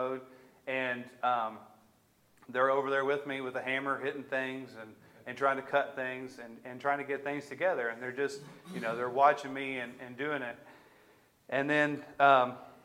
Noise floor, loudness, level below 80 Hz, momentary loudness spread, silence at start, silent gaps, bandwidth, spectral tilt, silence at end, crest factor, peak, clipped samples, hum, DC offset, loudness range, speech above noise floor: -67 dBFS; -32 LUFS; -82 dBFS; 18 LU; 0 s; none; 16 kHz; -5 dB/octave; 0.1 s; 22 dB; -10 dBFS; under 0.1%; none; under 0.1%; 3 LU; 35 dB